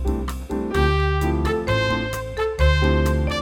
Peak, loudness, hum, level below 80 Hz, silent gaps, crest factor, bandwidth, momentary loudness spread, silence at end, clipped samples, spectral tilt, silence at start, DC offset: -6 dBFS; -21 LUFS; none; -24 dBFS; none; 14 dB; 16.5 kHz; 8 LU; 0 s; under 0.1%; -6 dB/octave; 0 s; under 0.1%